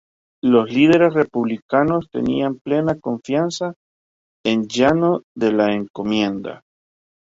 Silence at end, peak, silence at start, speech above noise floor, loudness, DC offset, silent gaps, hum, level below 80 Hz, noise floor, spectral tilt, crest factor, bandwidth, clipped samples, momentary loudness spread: 0.8 s; -2 dBFS; 0.45 s; over 72 dB; -19 LUFS; under 0.1%; 1.62-1.69 s, 2.61-2.65 s, 3.76-4.44 s, 5.23-5.35 s, 5.90-5.94 s; none; -54 dBFS; under -90 dBFS; -6 dB/octave; 16 dB; 7.8 kHz; under 0.1%; 10 LU